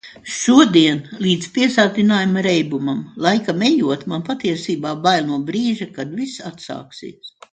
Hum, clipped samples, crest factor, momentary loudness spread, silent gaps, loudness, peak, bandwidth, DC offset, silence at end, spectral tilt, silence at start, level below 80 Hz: none; under 0.1%; 18 dB; 17 LU; none; -17 LUFS; 0 dBFS; 9.2 kHz; under 0.1%; 0.25 s; -4.5 dB/octave; 0.05 s; -60 dBFS